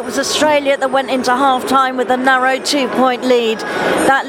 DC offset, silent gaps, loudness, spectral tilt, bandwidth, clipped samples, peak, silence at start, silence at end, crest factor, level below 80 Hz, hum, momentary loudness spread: under 0.1%; none; -14 LUFS; -2.5 dB/octave; 17.5 kHz; under 0.1%; 0 dBFS; 0 s; 0 s; 14 dB; -54 dBFS; none; 3 LU